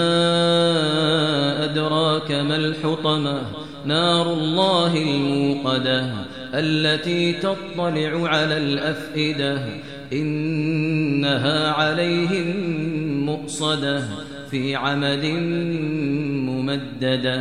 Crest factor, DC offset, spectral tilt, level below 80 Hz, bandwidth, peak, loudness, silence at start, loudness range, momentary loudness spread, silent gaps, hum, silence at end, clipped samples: 16 dB; 0.4%; -5.5 dB/octave; -56 dBFS; 10.5 kHz; -6 dBFS; -21 LUFS; 0 s; 3 LU; 7 LU; none; none; 0 s; under 0.1%